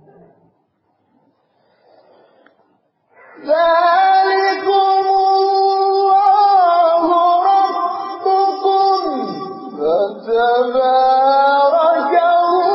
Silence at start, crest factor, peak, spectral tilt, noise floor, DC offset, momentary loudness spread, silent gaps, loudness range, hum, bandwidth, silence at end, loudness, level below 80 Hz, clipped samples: 3.4 s; 12 dB; -4 dBFS; -6.5 dB/octave; -63 dBFS; under 0.1%; 8 LU; none; 4 LU; none; 5.8 kHz; 0 s; -14 LUFS; -60 dBFS; under 0.1%